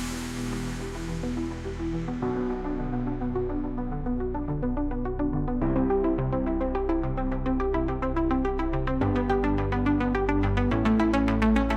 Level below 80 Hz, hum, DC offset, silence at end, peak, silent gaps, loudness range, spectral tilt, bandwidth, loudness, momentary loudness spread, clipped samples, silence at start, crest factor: -32 dBFS; none; under 0.1%; 0 s; -8 dBFS; none; 6 LU; -7.5 dB/octave; 13 kHz; -27 LUFS; 8 LU; under 0.1%; 0 s; 18 dB